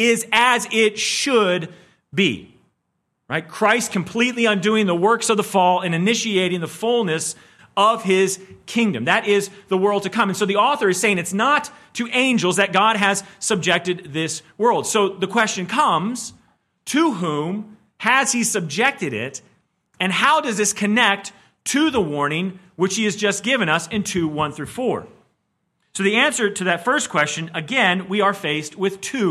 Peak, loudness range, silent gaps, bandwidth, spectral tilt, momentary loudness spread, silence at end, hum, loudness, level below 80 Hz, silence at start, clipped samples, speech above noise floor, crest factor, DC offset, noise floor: -2 dBFS; 3 LU; none; 15 kHz; -3.5 dB/octave; 10 LU; 0 s; none; -19 LUFS; -62 dBFS; 0 s; under 0.1%; 54 dB; 18 dB; under 0.1%; -73 dBFS